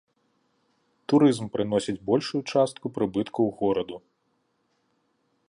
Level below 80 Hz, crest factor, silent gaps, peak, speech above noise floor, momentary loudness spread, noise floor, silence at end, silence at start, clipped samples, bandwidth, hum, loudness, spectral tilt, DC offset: -64 dBFS; 18 dB; none; -8 dBFS; 48 dB; 9 LU; -72 dBFS; 1.5 s; 1.1 s; under 0.1%; 11 kHz; none; -25 LUFS; -6.5 dB/octave; under 0.1%